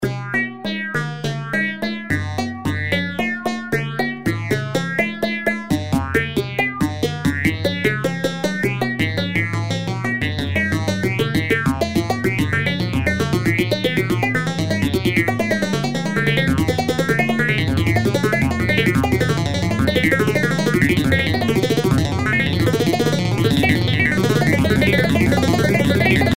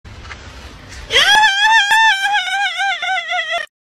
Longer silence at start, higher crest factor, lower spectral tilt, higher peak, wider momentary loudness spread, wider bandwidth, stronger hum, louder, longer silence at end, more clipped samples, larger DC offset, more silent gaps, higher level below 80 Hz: about the same, 0 s vs 0.05 s; about the same, 16 dB vs 16 dB; first, -6 dB/octave vs 0.5 dB/octave; about the same, -2 dBFS vs 0 dBFS; second, 6 LU vs 23 LU; about the same, 16 kHz vs 15.5 kHz; neither; second, -19 LUFS vs -13 LUFS; second, 0 s vs 0.3 s; neither; first, 0.6% vs under 0.1%; neither; about the same, -38 dBFS vs -42 dBFS